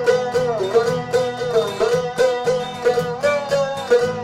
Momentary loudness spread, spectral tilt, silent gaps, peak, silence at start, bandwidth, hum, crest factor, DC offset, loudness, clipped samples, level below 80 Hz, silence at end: 3 LU; -4.5 dB/octave; none; -4 dBFS; 0 s; 14 kHz; none; 14 dB; under 0.1%; -19 LUFS; under 0.1%; -54 dBFS; 0 s